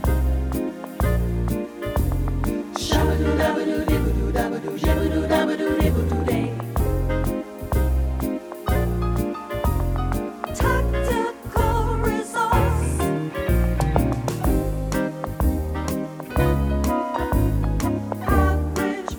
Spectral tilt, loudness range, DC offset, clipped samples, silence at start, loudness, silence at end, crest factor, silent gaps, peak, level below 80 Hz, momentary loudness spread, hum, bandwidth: -6.5 dB/octave; 2 LU; under 0.1%; under 0.1%; 0 s; -23 LUFS; 0 s; 20 dB; none; -2 dBFS; -26 dBFS; 6 LU; none; over 20 kHz